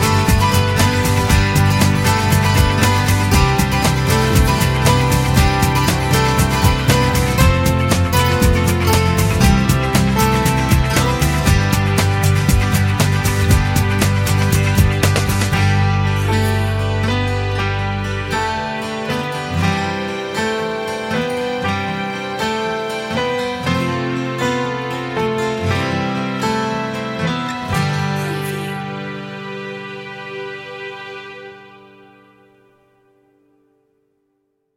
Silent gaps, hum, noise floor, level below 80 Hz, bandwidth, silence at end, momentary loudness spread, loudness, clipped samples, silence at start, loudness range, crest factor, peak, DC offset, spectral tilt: none; none; -67 dBFS; -26 dBFS; 17 kHz; 3.1 s; 9 LU; -16 LUFS; under 0.1%; 0 s; 9 LU; 16 dB; 0 dBFS; under 0.1%; -5 dB/octave